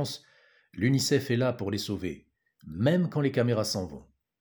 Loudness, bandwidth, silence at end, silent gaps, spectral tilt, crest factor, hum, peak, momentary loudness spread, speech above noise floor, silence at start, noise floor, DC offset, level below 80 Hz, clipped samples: -28 LUFS; over 20 kHz; 0.4 s; none; -5.5 dB/octave; 18 dB; none; -12 dBFS; 17 LU; 35 dB; 0 s; -62 dBFS; under 0.1%; -60 dBFS; under 0.1%